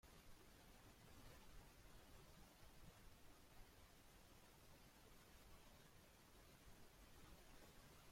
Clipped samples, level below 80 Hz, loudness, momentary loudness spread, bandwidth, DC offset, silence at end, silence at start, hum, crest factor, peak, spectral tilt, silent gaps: under 0.1%; -70 dBFS; -68 LUFS; 2 LU; 16.5 kHz; under 0.1%; 0 s; 0.05 s; none; 16 dB; -50 dBFS; -3.5 dB/octave; none